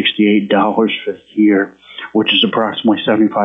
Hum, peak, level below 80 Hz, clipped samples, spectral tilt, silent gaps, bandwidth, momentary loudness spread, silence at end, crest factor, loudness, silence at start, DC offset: none; -2 dBFS; -62 dBFS; under 0.1%; -8 dB/octave; none; 3.9 kHz; 10 LU; 0 s; 12 dB; -14 LUFS; 0 s; under 0.1%